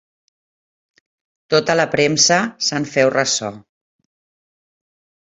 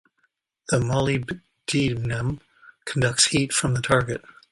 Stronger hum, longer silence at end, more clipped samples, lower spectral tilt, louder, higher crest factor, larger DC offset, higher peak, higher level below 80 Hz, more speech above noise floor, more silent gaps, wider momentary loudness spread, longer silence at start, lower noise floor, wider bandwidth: neither; first, 1.65 s vs 0.35 s; neither; second, -2.5 dB/octave vs -4 dB/octave; first, -16 LUFS vs -23 LUFS; about the same, 20 dB vs 20 dB; neither; about the same, -2 dBFS vs -4 dBFS; second, -60 dBFS vs -48 dBFS; first, over 73 dB vs 48 dB; neither; second, 7 LU vs 15 LU; first, 1.5 s vs 0.7 s; first, under -90 dBFS vs -71 dBFS; second, 8.4 kHz vs 11.5 kHz